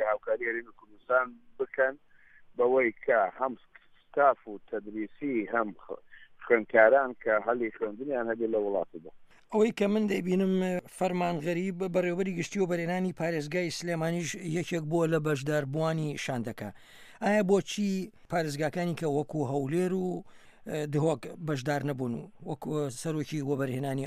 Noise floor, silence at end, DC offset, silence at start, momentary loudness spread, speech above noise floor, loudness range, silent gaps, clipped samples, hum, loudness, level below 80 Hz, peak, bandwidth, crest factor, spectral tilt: -55 dBFS; 0 s; under 0.1%; 0 s; 11 LU; 26 dB; 4 LU; none; under 0.1%; none; -30 LUFS; -66 dBFS; -8 dBFS; 15 kHz; 22 dB; -6 dB/octave